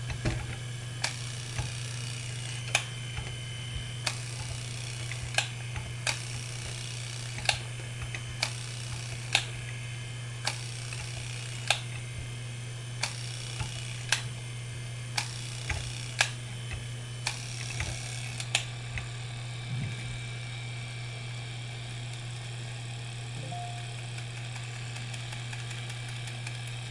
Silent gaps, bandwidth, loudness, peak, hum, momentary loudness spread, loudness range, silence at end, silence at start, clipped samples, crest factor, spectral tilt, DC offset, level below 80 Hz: none; 11.5 kHz; -35 LUFS; -4 dBFS; none; 9 LU; 5 LU; 0 s; 0 s; under 0.1%; 32 dB; -3 dB/octave; under 0.1%; -52 dBFS